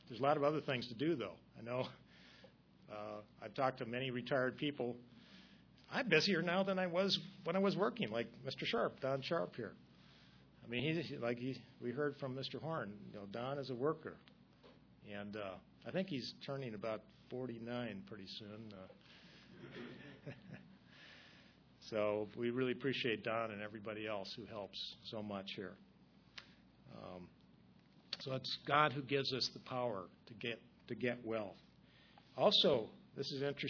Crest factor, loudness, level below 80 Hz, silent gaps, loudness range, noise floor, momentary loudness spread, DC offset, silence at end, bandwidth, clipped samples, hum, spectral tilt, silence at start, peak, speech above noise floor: 24 dB; -40 LUFS; -78 dBFS; none; 12 LU; -67 dBFS; 21 LU; under 0.1%; 0 s; 5.4 kHz; under 0.1%; none; -3 dB/octave; 0.05 s; -18 dBFS; 26 dB